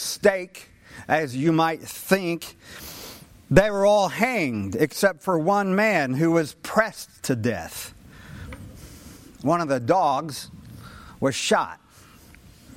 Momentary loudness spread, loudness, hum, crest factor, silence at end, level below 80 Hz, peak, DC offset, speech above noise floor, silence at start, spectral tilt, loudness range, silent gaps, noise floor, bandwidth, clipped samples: 21 LU; -23 LUFS; none; 22 dB; 1 s; -48 dBFS; -4 dBFS; under 0.1%; 28 dB; 0 s; -5 dB/octave; 6 LU; none; -50 dBFS; 16.5 kHz; under 0.1%